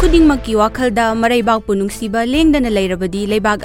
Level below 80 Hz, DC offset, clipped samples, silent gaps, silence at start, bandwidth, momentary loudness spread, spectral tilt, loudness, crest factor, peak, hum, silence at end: -26 dBFS; under 0.1%; under 0.1%; none; 0 s; 16.5 kHz; 6 LU; -5.5 dB/octave; -15 LUFS; 14 dB; 0 dBFS; none; 0 s